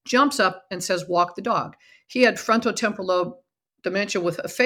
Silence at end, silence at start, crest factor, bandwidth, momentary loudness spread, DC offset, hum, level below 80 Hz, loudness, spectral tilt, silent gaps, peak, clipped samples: 0 s; 0.05 s; 20 dB; 18 kHz; 11 LU; under 0.1%; none; -68 dBFS; -23 LUFS; -3.5 dB/octave; none; -4 dBFS; under 0.1%